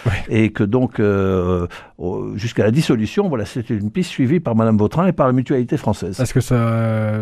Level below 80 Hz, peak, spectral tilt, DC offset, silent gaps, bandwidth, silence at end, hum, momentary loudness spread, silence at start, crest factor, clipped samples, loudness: -40 dBFS; -2 dBFS; -7.5 dB/octave; under 0.1%; none; 14 kHz; 0 s; none; 7 LU; 0 s; 14 dB; under 0.1%; -18 LUFS